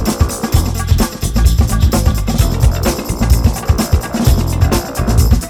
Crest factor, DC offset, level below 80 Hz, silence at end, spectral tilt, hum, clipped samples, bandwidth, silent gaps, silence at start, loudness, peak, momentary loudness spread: 12 dB; under 0.1%; -16 dBFS; 0 s; -5.5 dB/octave; none; under 0.1%; over 20 kHz; none; 0 s; -14 LUFS; 0 dBFS; 3 LU